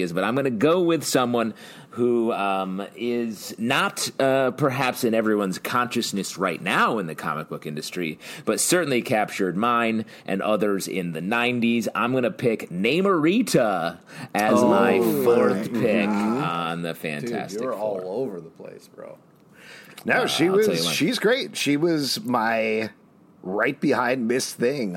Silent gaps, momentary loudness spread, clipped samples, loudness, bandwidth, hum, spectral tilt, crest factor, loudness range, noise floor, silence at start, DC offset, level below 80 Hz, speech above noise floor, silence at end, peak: none; 11 LU; under 0.1%; -23 LUFS; 16.5 kHz; none; -4.5 dB/octave; 18 dB; 5 LU; -47 dBFS; 0 s; under 0.1%; -70 dBFS; 24 dB; 0 s; -4 dBFS